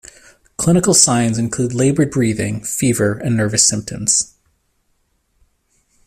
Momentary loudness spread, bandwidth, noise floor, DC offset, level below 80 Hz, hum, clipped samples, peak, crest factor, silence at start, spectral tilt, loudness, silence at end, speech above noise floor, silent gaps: 10 LU; 15.5 kHz; -64 dBFS; under 0.1%; -48 dBFS; none; under 0.1%; 0 dBFS; 18 dB; 0.6 s; -4 dB/octave; -15 LUFS; 1.8 s; 48 dB; none